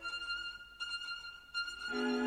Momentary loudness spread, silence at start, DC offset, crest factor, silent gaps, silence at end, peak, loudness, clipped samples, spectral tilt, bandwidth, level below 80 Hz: 7 LU; 0 s; under 0.1%; 16 dB; none; 0 s; -24 dBFS; -40 LUFS; under 0.1%; -2 dB/octave; 15.5 kHz; -66 dBFS